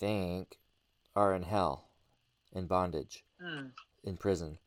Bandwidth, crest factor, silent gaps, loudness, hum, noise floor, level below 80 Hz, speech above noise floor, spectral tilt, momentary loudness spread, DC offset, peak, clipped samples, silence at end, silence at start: 16 kHz; 24 dB; none; -35 LUFS; none; -74 dBFS; -58 dBFS; 40 dB; -6.5 dB/octave; 16 LU; under 0.1%; -14 dBFS; under 0.1%; 0.1 s; 0 s